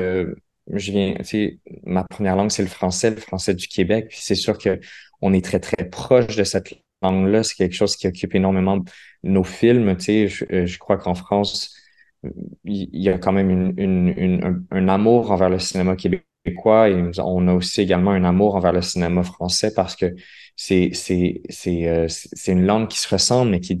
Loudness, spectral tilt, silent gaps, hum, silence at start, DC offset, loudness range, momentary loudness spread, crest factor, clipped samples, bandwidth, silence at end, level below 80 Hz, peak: -20 LUFS; -5.5 dB/octave; none; none; 0 s; under 0.1%; 4 LU; 10 LU; 18 dB; under 0.1%; 12.5 kHz; 0 s; -40 dBFS; -2 dBFS